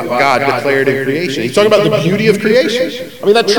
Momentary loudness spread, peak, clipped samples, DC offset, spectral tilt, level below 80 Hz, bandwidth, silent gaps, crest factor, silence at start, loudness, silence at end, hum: 6 LU; 0 dBFS; 0.2%; 0.9%; -5 dB/octave; -58 dBFS; 19 kHz; none; 12 dB; 0 s; -12 LUFS; 0 s; none